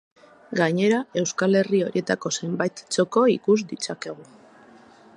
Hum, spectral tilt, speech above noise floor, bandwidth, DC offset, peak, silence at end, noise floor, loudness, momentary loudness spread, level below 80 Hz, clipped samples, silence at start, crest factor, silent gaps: none; -5 dB/octave; 28 dB; 11 kHz; under 0.1%; -6 dBFS; 0.95 s; -50 dBFS; -23 LUFS; 11 LU; -72 dBFS; under 0.1%; 0.5 s; 18 dB; none